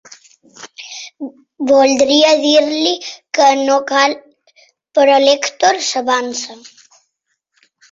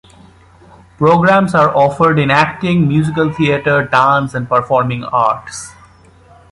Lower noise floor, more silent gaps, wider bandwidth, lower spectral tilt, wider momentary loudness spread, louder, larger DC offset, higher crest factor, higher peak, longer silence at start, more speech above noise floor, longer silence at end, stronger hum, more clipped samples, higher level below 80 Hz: first, -71 dBFS vs -44 dBFS; neither; second, 7.8 kHz vs 11.5 kHz; second, -1 dB/octave vs -6.5 dB/octave; first, 19 LU vs 6 LU; about the same, -13 LUFS vs -13 LUFS; neither; about the same, 16 dB vs 14 dB; about the same, 0 dBFS vs 0 dBFS; second, 0.6 s vs 1 s; first, 58 dB vs 31 dB; first, 1.35 s vs 0.8 s; neither; neither; second, -62 dBFS vs -46 dBFS